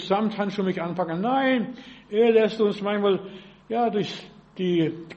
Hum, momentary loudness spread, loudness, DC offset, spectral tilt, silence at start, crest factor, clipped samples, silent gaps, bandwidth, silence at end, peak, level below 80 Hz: none; 13 LU; -24 LUFS; under 0.1%; -7 dB/octave; 0 s; 16 dB; under 0.1%; none; 8.2 kHz; 0 s; -8 dBFS; -64 dBFS